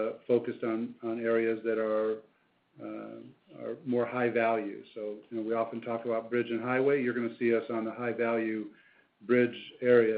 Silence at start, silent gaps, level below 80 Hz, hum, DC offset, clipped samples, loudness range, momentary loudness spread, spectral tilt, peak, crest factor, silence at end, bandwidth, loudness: 0 s; none; -80 dBFS; none; under 0.1%; under 0.1%; 3 LU; 14 LU; -5 dB/octave; -12 dBFS; 20 dB; 0 s; 4.7 kHz; -31 LUFS